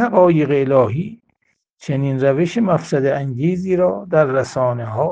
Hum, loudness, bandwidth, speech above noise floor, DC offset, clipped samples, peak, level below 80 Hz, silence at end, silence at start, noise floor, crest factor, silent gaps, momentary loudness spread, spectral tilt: none; -17 LUFS; 9.2 kHz; 51 dB; under 0.1%; under 0.1%; 0 dBFS; -54 dBFS; 0 s; 0 s; -67 dBFS; 16 dB; 1.73-1.77 s; 8 LU; -8 dB/octave